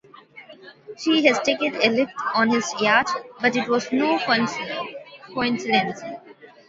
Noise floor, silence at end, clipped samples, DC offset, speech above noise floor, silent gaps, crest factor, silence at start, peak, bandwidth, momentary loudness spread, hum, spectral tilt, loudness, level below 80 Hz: -46 dBFS; 0.25 s; under 0.1%; under 0.1%; 25 dB; none; 22 dB; 0.35 s; 0 dBFS; 8 kHz; 16 LU; none; -3.5 dB/octave; -21 LUFS; -64 dBFS